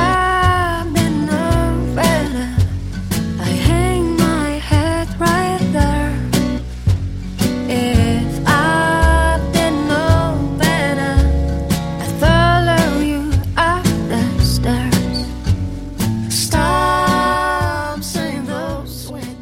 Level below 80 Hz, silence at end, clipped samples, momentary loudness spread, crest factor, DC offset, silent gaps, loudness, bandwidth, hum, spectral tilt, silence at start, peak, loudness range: -24 dBFS; 0 s; under 0.1%; 8 LU; 16 dB; under 0.1%; none; -16 LUFS; 16.5 kHz; none; -5.5 dB/octave; 0 s; 0 dBFS; 2 LU